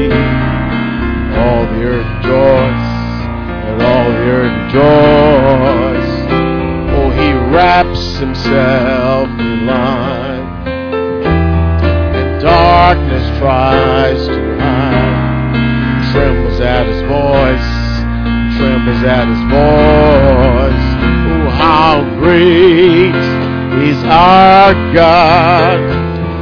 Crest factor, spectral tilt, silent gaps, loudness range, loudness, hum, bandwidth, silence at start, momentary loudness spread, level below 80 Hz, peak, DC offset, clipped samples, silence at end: 10 dB; -8 dB/octave; none; 6 LU; -10 LUFS; none; 5.4 kHz; 0 s; 9 LU; -20 dBFS; 0 dBFS; under 0.1%; 0.8%; 0 s